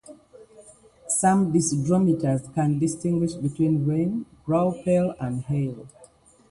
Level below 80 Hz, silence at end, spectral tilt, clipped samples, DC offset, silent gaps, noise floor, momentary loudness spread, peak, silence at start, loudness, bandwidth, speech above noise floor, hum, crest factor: -56 dBFS; 0.45 s; -6.5 dB/octave; under 0.1%; under 0.1%; none; -54 dBFS; 7 LU; -8 dBFS; 0.1 s; -24 LUFS; 11.5 kHz; 31 dB; none; 18 dB